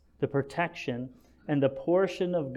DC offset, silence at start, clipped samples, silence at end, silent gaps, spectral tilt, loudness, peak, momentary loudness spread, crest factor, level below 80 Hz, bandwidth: under 0.1%; 0.2 s; under 0.1%; 0 s; none; -7.5 dB/octave; -30 LUFS; -14 dBFS; 11 LU; 16 dB; -62 dBFS; 12 kHz